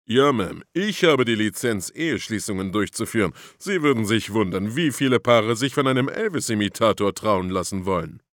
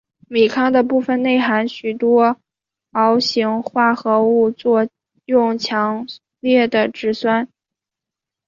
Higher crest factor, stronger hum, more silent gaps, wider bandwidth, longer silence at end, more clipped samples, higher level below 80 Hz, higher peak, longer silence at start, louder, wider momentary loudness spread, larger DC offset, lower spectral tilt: first, 20 dB vs 14 dB; neither; neither; first, 18 kHz vs 7.4 kHz; second, 0.2 s vs 1 s; neither; first, -56 dBFS vs -64 dBFS; about the same, -2 dBFS vs -2 dBFS; second, 0.1 s vs 0.3 s; second, -22 LUFS vs -17 LUFS; about the same, 8 LU vs 9 LU; neither; about the same, -5 dB/octave vs -5.5 dB/octave